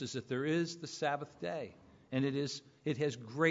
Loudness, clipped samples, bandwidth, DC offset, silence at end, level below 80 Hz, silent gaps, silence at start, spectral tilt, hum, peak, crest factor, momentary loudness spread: -37 LUFS; under 0.1%; 7.4 kHz; under 0.1%; 0 s; -76 dBFS; none; 0 s; -4.5 dB/octave; none; -16 dBFS; 20 dB; 7 LU